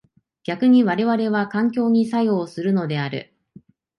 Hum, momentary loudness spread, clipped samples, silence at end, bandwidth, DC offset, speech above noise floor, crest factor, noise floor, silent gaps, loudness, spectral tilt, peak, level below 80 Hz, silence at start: none; 12 LU; under 0.1%; 0.75 s; 10.5 kHz; under 0.1%; 31 dB; 14 dB; -50 dBFS; none; -20 LUFS; -8 dB/octave; -6 dBFS; -66 dBFS; 0.5 s